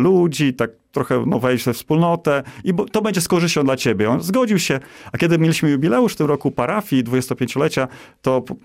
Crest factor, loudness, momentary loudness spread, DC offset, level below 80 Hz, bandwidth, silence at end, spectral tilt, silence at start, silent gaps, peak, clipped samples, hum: 12 dB; -19 LUFS; 6 LU; under 0.1%; -54 dBFS; 16 kHz; 0.05 s; -5.5 dB/octave; 0 s; none; -6 dBFS; under 0.1%; none